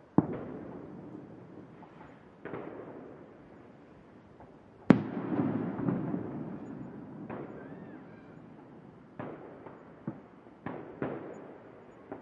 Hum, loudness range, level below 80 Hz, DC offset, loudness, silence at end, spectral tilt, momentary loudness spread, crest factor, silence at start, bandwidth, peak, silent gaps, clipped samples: none; 15 LU; -68 dBFS; under 0.1%; -36 LUFS; 0 s; -9.5 dB/octave; 22 LU; 34 dB; 0 s; 7.6 kHz; -4 dBFS; none; under 0.1%